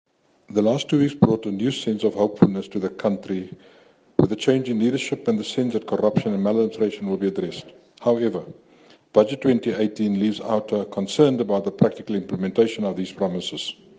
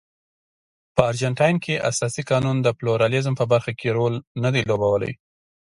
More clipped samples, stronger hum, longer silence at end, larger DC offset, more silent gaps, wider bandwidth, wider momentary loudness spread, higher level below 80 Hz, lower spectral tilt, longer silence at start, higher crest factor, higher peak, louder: neither; neither; second, 0.25 s vs 0.65 s; neither; second, none vs 4.27-4.35 s; second, 9.4 kHz vs 11.5 kHz; first, 9 LU vs 5 LU; second, -62 dBFS vs -52 dBFS; about the same, -6.5 dB/octave vs -5.5 dB/octave; second, 0.5 s vs 0.95 s; about the same, 22 dB vs 22 dB; about the same, 0 dBFS vs 0 dBFS; about the same, -22 LUFS vs -22 LUFS